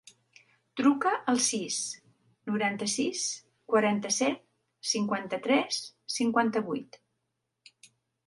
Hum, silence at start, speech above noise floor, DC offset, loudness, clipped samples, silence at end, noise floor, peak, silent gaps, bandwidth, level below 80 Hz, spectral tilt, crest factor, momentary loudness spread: none; 0.75 s; 53 dB; under 0.1%; -29 LUFS; under 0.1%; 1.45 s; -82 dBFS; -12 dBFS; none; 11.5 kHz; -78 dBFS; -3 dB/octave; 20 dB; 11 LU